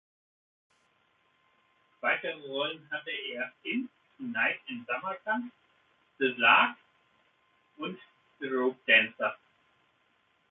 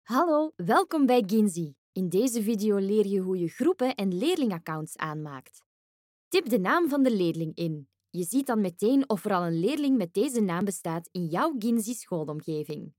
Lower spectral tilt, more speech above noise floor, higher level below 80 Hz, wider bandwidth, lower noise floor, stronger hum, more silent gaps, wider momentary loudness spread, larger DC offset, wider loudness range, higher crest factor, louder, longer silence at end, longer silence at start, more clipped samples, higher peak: second, 0 dB/octave vs -5.5 dB/octave; second, 41 dB vs over 63 dB; about the same, -84 dBFS vs -80 dBFS; second, 4.1 kHz vs 17 kHz; second, -71 dBFS vs under -90 dBFS; neither; second, none vs 1.78-1.93 s, 5.66-6.31 s; first, 18 LU vs 10 LU; neither; first, 8 LU vs 3 LU; first, 24 dB vs 16 dB; about the same, -29 LUFS vs -27 LUFS; first, 1.15 s vs 0.1 s; first, 2.05 s vs 0.1 s; neither; about the same, -8 dBFS vs -10 dBFS